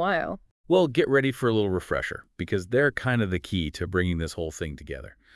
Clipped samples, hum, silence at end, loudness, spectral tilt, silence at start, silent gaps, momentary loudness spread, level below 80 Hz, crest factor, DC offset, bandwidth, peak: under 0.1%; none; 0.25 s; -26 LUFS; -6 dB/octave; 0 s; 0.51-0.64 s; 13 LU; -48 dBFS; 18 dB; under 0.1%; 12 kHz; -8 dBFS